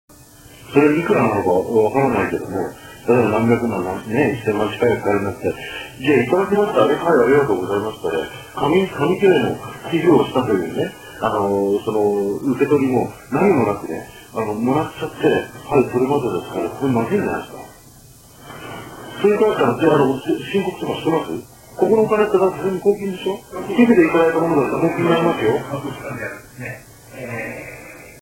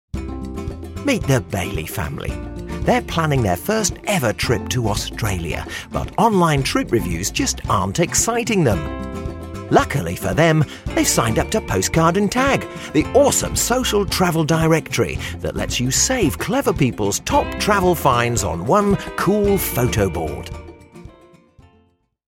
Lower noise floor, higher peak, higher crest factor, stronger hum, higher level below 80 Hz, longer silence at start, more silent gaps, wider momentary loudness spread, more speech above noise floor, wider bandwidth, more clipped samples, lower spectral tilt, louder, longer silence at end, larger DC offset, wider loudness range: second, -45 dBFS vs -59 dBFS; about the same, 0 dBFS vs 0 dBFS; about the same, 18 dB vs 18 dB; neither; second, -50 dBFS vs -34 dBFS; first, 0.5 s vs 0.15 s; neither; first, 14 LU vs 11 LU; second, 27 dB vs 41 dB; about the same, 16.5 kHz vs 17.5 kHz; neither; first, -6.5 dB/octave vs -4.5 dB/octave; about the same, -18 LUFS vs -19 LUFS; second, 0 s vs 1.2 s; neither; about the same, 4 LU vs 3 LU